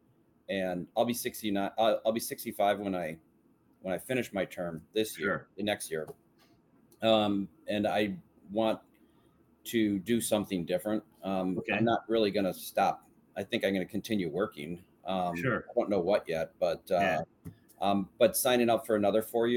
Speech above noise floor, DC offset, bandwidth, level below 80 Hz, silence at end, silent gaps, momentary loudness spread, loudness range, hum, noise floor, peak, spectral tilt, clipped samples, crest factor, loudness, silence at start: 36 dB; under 0.1%; 18 kHz; -68 dBFS; 0 s; none; 11 LU; 4 LU; none; -66 dBFS; -12 dBFS; -4.5 dB/octave; under 0.1%; 20 dB; -31 LUFS; 0.5 s